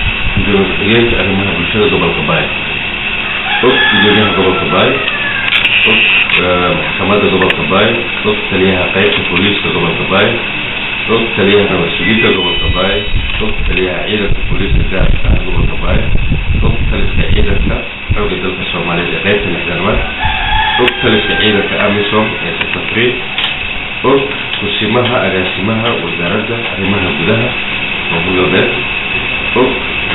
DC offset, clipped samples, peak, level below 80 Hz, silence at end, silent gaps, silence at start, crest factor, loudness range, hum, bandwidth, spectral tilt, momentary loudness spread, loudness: 2%; under 0.1%; 0 dBFS; -20 dBFS; 0 s; none; 0 s; 12 dB; 5 LU; none; 4.1 kHz; -2.5 dB/octave; 6 LU; -11 LUFS